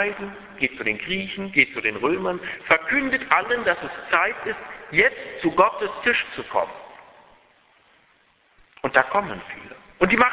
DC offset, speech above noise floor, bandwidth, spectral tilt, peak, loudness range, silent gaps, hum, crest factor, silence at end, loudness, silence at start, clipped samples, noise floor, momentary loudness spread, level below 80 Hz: under 0.1%; 38 dB; 4 kHz; -7.5 dB/octave; 0 dBFS; 6 LU; none; none; 24 dB; 0 s; -22 LUFS; 0 s; under 0.1%; -61 dBFS; 14 LU; -56 dBFS